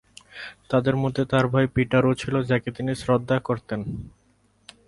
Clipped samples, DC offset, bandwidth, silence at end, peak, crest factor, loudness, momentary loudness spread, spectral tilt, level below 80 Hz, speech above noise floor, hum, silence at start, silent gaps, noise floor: under 0.1%; under 0.1%; 11.5 kHz; 0.8 s; -6 dBFS; 18 dB; -24 LUFS; 17 LU; -7 dB/octave; -50 dBFS; 40 dB; none; 0.35 s; none; -63 dBFS